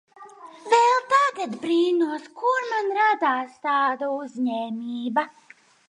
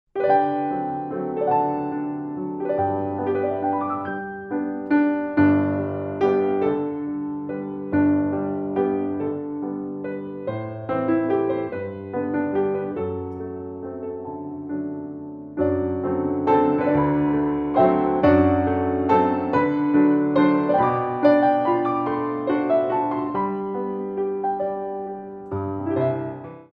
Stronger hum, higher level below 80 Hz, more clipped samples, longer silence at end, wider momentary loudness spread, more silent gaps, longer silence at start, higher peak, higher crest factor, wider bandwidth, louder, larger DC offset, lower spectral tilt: neither; second, -82 dBFS vs -54 dBFS; neither; first, 0.6 s vs 0.1 s; about the same, 11 LU vs 12 LU; neither; about the same, 0.2 s vs 0.15 s; about the same, -6 dBFS vs -4 dBFS; about the same, 18 dB vs 20 dB; first, 10.5 kHz vs 5.2 kHz; about the same, -23 LUFS vs -23 LUFS; neither; second, -3.5 dB/octave vs -10 dB/octave